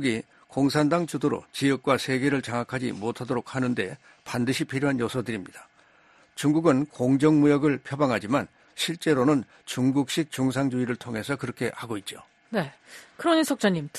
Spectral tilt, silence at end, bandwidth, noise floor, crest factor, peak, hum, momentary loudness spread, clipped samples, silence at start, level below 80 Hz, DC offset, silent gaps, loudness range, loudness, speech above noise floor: -5.5 dB/octave; 0 s; 13 kHz; -58 dBFS; 18 dB; -8 dBFS; none; 12 LU; under 0.1%; 0 s; -62 dBFS; under 0.1%; none; 5 LU; -26 LUFS; 33 dB